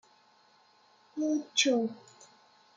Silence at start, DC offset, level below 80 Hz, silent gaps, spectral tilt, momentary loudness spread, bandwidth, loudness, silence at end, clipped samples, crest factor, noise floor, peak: 1.15 s; under 0.1%; -90 dBFS; none; -2 dB/octave; 18 LU; 9.6 kHz; -29 LUFS; 0.8 s; under 0.1%; 22 dB; -64 dBFS; -12 dBFS